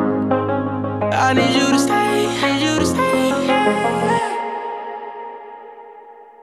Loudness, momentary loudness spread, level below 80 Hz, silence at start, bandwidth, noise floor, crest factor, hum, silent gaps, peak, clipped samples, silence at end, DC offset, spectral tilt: -18 LUFS; 17 LU; -50 dBFS; 0 s; 14.5 kHz; -41 dBFS; 16 dB; none; none; -2 dBFS; under 0.1%; 0.2 s; under 0.1%; -4.5 dB/octave